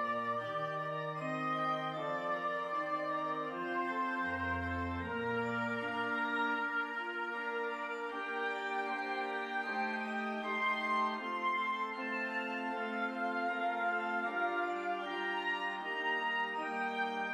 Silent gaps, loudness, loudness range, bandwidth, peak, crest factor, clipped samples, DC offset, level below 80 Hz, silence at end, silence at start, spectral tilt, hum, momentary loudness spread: none; -36 LUFS; 1 LU; 15 kHz; -24 dBFS; 14 dB; under 0.1%; under 0.1%; -68 dBFS; 0 s; 0 s; -5.5 dB/octave; none; 4 LU